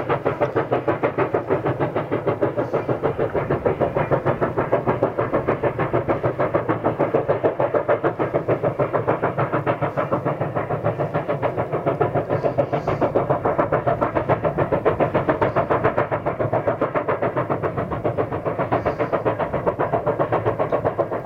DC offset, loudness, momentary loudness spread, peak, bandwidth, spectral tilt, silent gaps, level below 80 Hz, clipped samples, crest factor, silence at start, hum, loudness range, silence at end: under 0.1%; -22 LUFS; 3 LU; -4 dBFS; 7 kHz; -9.5 dB/octave; none; -48 dBFS; under 0.1%; 18 dB; 0 s; none; 2 LU; 0 s